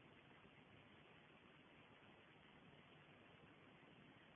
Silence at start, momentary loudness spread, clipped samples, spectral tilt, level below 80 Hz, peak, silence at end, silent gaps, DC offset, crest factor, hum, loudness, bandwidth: 0 s; 1 LU; under 0.1%; -3 dB/octave; -88 dBFS; -52 dBFS; 0 s; none; under 0.1%; 14 dB; none; -67 LUFS; 3.7 kHz